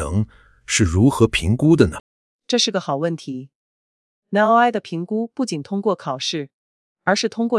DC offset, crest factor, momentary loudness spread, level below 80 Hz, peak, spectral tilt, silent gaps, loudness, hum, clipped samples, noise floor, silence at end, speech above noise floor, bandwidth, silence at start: under 0.1%; 20 dB; 14 LU; -44 dBFS; 0 dBFS; -5 dB/octave; 2.00-2.39 s, 3.55-4.22 s, 6.54-6.96 s; -19 LUFS; none; under 0.1%; under -90 dBFS; 0 s; over 71 dB; 12 kHz; 0 s